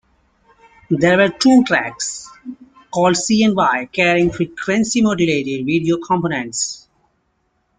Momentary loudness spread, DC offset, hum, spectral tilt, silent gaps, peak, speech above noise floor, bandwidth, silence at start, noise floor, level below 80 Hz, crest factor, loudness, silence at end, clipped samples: 11 LU; under 0.1%; none; -4.5 dB/octave; none; -2 dBFS; 50 dB; 9.6 kHz; 0.9 s; -66 dBFS; -50 dBFS; 16 dB; -16 LUFS; 1 s; under 0.1%